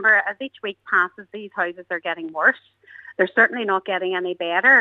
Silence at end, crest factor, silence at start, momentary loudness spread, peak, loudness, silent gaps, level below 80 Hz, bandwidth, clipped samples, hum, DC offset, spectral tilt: 0 s; 20 dB; 0 s; 15 LU; -2 dBFS; -21 LUFS; none; -80 dBFS; 6.8 kHz; under 0.1%; none; under 0.1%; -5.5 dB/octave